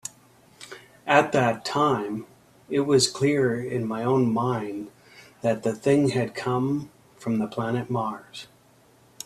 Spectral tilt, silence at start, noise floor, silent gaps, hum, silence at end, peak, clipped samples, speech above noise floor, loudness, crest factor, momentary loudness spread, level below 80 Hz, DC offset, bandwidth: -5 dB/octave; 0.05 s; -57 dBFS; none; none; 0.8 s; -2 dBFS; under 0.1%; 33 dB; -24 LUFS; 22 dB; 18 LU; -64 dBFS; under 0.1%; 14 kHz